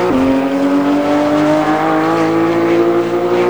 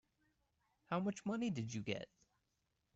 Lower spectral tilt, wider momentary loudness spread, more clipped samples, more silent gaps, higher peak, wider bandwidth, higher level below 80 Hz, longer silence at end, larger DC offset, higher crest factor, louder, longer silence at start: about the same, -6.5 dB/octave vs -6 dB/octave; second, 1 LU vs 6 LU; neither; neither; first, -2 dBFS vs -28 dBFS; first, over 20 kHz vs 8.2 kHz; first, -44 dBFS vs -78 dBFS; second, 0 s vs 0.9 s; first, 0.7% vs under 0.1%; second, 10 dB vs 18 dB; first, -13 LUFS vs -43 LUFS; second, 0 s vs 0.9 s